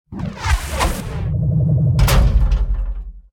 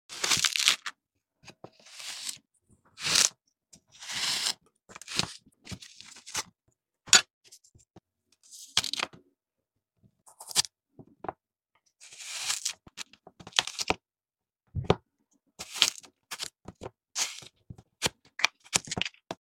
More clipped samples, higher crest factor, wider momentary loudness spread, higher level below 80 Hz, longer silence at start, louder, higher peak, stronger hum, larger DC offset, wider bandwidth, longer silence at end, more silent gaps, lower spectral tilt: neither; second, 14 dB vs 34 dB; second, 11 LU vs 23 LU; first, -20 dBFS vs -60 dBFS; about the same, 0.1 s vs 0.1 s; first, -18 LUFS vs -28 LUFS; about the same, -2 dBFS vs 0 dBFS; neither; neither; about the same, 17.5 kHz vs 17 kHz; about the same, 0.15 s vs 0.1 s; second, none vs 7.33-7.41 s; first, -5.5 dB/octave vs -0.5 dB/octave